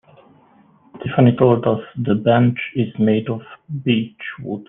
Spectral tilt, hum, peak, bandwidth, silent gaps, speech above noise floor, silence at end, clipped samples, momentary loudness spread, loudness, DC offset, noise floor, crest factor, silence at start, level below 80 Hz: -11 dB/octave; none; -2 dBFS; 3.8 kHz; none; 35 dB; 0.05 s; under 0.1%; 15 LU; -18 LUFS; under 0.1%; -52 dBFS; 18 dB; 0.95 s; -56 dBFS